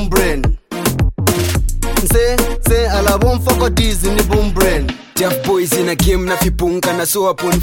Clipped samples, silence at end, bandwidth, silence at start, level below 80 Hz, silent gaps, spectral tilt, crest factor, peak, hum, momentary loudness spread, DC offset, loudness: under 0.1%; 0 s; 17 kHz; 0 s; -18 dBFS; none; -4.5 dB/octave; 14 dB; 0 dBFS; none; 5 LU; under 0.1%; -15 LUFS